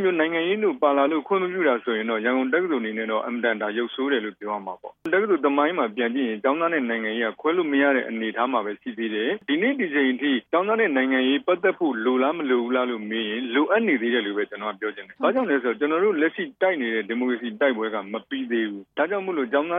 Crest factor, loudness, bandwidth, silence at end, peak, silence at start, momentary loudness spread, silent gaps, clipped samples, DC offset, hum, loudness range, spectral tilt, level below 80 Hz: 18 dB; -23 LUFS; 3.8 kHz; 0 s; -6 dBFS; 0 s; 7 LU; none; under 0.1%; under 0.1%; none; 3 LU; -7.5 dB/octave; -76 dBFS